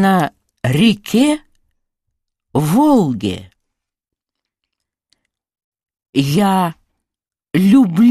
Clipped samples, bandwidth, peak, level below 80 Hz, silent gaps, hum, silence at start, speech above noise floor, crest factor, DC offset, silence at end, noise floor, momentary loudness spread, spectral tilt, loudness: under 0.1%; 14.5 kHz; -2 dBFS; -52 dBFS; 5.64-5.72 s, 6.09-6.13 s; none; 0 s; 68 dB; 16 dB; under 0.1%; 0 s; -80 dBFS; 12 LU; -6.5 dB/octave; -15 LUFS